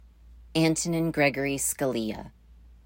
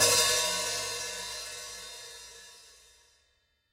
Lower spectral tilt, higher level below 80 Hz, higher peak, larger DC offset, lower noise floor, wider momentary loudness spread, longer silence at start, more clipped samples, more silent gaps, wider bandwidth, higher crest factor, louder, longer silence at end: first, -4 dB/octave vs 0.5 dB/octave; first, -52 dBFS vs -62 dBFS; about the same, -10 dBFS vs -10 dBFS; neither; second, -51 dBFS vs -73 dBFS; second, 8 LU vs 23 LU; first, 0.25 s vs 0 s; neither; neither; about the same, 16.5 kHz vs 16 kHz; about the same, 18 dB vs 22 dB; about the same, -26 LUFS vs -28 LUFS; second, 0.15 s vs 1 s